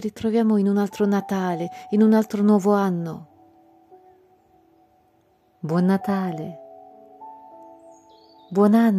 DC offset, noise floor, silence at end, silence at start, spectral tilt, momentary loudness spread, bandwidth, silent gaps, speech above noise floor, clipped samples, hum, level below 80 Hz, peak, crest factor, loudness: under 0.1%; -61 dBFS; 0 s; 0 s; -8 dB/octave; 19 LU; 14 kHz; none; 41 dB; under 0.1%; none; -68 dBFS; -6 dBFS; 16 dB; -21 LUFS